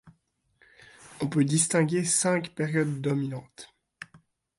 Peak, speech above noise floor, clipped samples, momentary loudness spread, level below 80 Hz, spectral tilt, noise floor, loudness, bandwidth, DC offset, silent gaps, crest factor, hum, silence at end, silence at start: -10 dBFS; 43 dB; under 0.1%; 23 LU; -68 dBFS; -4.5 dB/octave; -70 dBFS; -26 LUFS; 11.5 kHz; under 0.1%; none; 18 dB; none; 0.4 s; 0.05 s